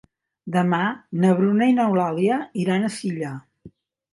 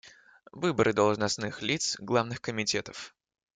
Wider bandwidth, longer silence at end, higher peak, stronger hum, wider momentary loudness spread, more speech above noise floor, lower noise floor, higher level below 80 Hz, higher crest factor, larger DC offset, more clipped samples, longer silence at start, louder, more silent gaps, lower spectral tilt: first, 11.5 kHz vs 9.6 kHz; about the same, 0.45 s vs 0.45 s; first, -6 dBFS vs -10 dBFS; neither; about the same, 12 LU vs 11 LU; about the same, 29 dB vs 26 dB; second, -49 dBFS vs -55 dBFS; about the same, -68 dBFS vs -64 dBFS; about the same, 16 dB vs 20 dB; neither; neither; first, 0.45 s vs 0.05 s; first, -21 LUFS vs -29 LUFS; neither; first, -7 dB/octave vs -3.5 dB/octave